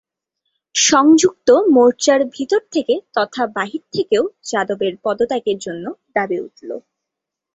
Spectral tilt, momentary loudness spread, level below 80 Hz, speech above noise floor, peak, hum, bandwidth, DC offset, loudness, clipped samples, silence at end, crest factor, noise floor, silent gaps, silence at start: -3 dB/octave; 13 LU; -60 dBFS; 66 dB; -2 dBFS; none; 8.4 kHz; under 0.1%; -16 LUFS; under 0.1%; 0.75 s; 16 dB; -82 dBFS; none; 0.75 s